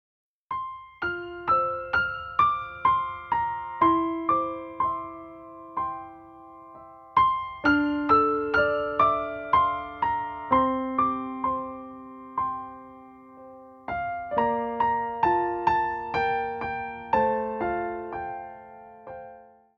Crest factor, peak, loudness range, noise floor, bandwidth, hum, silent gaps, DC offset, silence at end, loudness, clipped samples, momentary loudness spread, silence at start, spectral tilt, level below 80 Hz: 20 dB; -8 dBFS; 7 LU; -50 dBFS; 6.8 kHz; none; none; under 0.1%; 0.3 s; -26 LUFS; under 0.1%; 20 LU; 0.5 s; -7.5 dB/octave; -54 dBFS